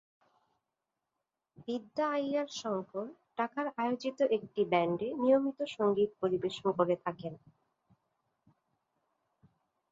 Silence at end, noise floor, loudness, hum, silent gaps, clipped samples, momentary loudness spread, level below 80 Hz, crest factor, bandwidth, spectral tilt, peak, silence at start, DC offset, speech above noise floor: 2.55 s; -88 dBFS; -33 LUFS; none; none; under 0.1%; 11 LU; -76 dBFS; 20 dB; 7.8 kHz; -6 dB/octave; -14 dBFS; 1.6 s; under 0.1%; 55 dB